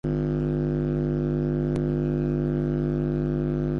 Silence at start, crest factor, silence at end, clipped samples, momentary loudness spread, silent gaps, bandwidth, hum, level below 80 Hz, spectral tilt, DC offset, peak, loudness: 0.05 s; 10 dB; 0 s; under 0.1%; 1 LU; none; 5.4 kHz; 50 Hz at -30 dBFS; -36 dBFS; -10.5 dB/octave; under 0.1%; -14 dBFS; -26 LUFS